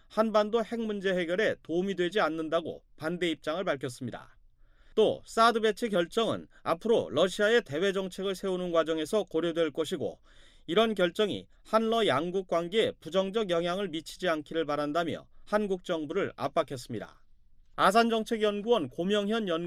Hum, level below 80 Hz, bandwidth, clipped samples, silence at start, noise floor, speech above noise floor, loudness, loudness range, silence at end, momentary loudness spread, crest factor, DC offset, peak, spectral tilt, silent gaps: none; -58 dBFS; 15 kHz; under 0.1%; 0.1 s; -58 dBFS; 29 dB; -29 LUFS; 4 LU; 0 s; 10 LU; 18 dB; under 0.1%; -12 dBFS; -5 dB/octave; none